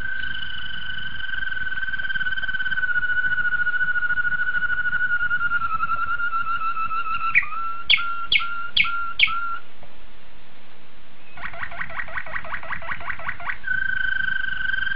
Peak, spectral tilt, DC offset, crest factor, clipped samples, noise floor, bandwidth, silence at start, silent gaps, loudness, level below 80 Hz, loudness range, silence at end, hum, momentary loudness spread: -4 dBFS; -4.5 dB/octave; 7%; 22 dB; under 0.1%; -51 dBFS; 5.4 kHz; 0 s; none; -23 LUFS; -48 dBFS; 10 LU; 0 s; none; 11 LU